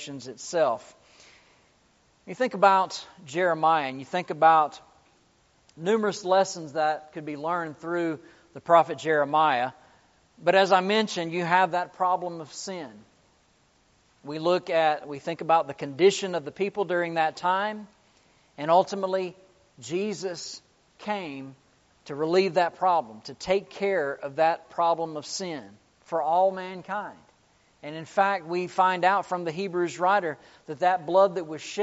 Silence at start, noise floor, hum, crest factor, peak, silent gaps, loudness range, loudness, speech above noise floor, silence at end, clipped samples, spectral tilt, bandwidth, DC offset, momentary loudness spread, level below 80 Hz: 0 s; -64 dBFS; none; 22 dB; -4 dBFS; none; 5 LU; -26 LUFS; 38 dB; 0 s; under 0.1%; -3 dB/octave; 8 kHz; under 0.1%; 16 LU; -72 dBFS